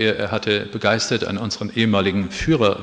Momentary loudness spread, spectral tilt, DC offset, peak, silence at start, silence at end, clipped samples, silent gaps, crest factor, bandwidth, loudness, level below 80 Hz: 6 LU; -5 dB/octave; under 0.1%; -2 dBFS; 0 s; 0 s; under 0.1%; none; 18 dB; 9.8 kHz; -20 LUFS; -44 dBFS